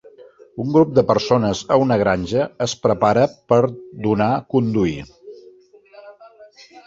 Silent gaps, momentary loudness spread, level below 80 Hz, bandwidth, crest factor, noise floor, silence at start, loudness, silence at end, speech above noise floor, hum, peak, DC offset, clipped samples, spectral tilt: none; 9 LU; -48 dBFS; 7.8 kHz; 18 dB; -48 dBFS; 0.2 s; -18 LUFS; 0.05 s; 31 dB; none; -2 dBFS; under 0.1%; under 0.1%; -6.5 dB/octave